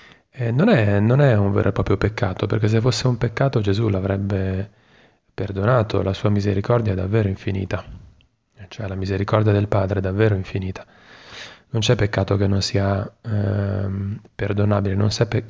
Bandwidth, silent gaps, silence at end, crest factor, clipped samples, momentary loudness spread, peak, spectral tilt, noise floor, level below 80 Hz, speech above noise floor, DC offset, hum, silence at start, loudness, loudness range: 7.8 kHz; none; 0 s; 18 dB; under 0.1%; 12 LU; -2 dBFS; -7 dB/octave; -56 dBFS; -38 dBFS; 36 dB; under 0.1%; none; 0.35 s; -21 LUFS; 4 LU